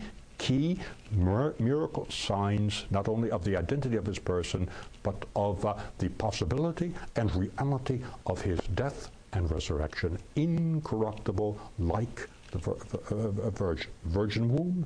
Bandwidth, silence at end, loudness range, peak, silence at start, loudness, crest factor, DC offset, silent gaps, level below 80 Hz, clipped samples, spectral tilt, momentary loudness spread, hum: 10.5 kHz; 0 s; 3 LU; -14 dBFS; 0 s; -32 LUFS; 16 dB; under 0.1%; none; -44 dBFS; under 0.1%; -6.5 dB/octave; 7 LU; none